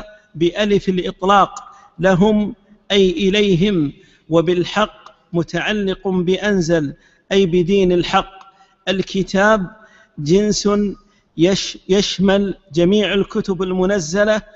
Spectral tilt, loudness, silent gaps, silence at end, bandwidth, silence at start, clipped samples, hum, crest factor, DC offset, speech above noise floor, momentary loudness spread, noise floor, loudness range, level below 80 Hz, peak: -5.5 dB/octave; -17 LUFS; none; 0.15 s; 8 kHz; 0 s; under 0.1%; none; 16 dB; under 0.1%; 30 dB; 9 LU; -46 dBFS; 2 LU; -42 dBFS; 0 dBFS